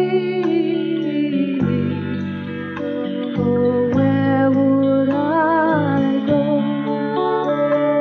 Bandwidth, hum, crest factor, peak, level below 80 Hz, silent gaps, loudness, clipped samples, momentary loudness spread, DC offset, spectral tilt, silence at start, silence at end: 5.8 kHz; none; 12 dB; -4 dBFS; -54 dBFS; none; -18 LUFS; under 0.1%; 8 LU; under 0.1%; -9.5 dB/octave; 0 s; 0 s